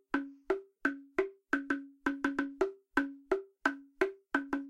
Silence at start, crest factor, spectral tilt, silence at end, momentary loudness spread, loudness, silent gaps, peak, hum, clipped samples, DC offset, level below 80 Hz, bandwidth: 0.15 s; 22 dB; -4.5 dB/octave; 0 s; 4 LU; -36 LUFS; none; -14 dBFS; none; under 0.1%; under 0.1%; -64 dBFS; 11.5 kHz